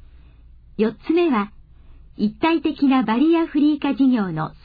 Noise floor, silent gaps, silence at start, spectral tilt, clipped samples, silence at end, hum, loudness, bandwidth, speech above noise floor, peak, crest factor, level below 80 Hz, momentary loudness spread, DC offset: -46 dBFS; none; 0.8 s; -9.5 dB/octave; under 0.1%; 0.15 s; none; -20 LUFS; 5 kHz; 27 dB; -8 dBFS; 12 dB; -48 dBFS; 8 LU; under 0.1%